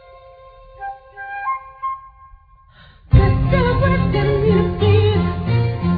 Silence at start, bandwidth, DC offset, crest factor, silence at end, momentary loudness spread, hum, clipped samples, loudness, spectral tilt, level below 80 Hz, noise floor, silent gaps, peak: 0.75 s; 5 kHz; under 0.1%; 16 dB; 0 s; 18 LU; none; under 0.1%; -17 LUFS; -10.5 dB/octave; -28 dBFS; -48 dBFS; none; -2 dBFS